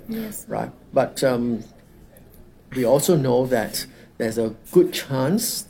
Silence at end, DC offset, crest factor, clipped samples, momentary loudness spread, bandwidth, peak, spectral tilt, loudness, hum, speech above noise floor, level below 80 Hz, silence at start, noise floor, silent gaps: 0.05 s; under 0.1%; 18 dB; under 0.1%; 12 LU; 17.5 kHz; -4 dBFS; -5 dB/octave; -22 LUFS; none; 26 dB; -52 dBFS; 0 s; -48 dBFS; none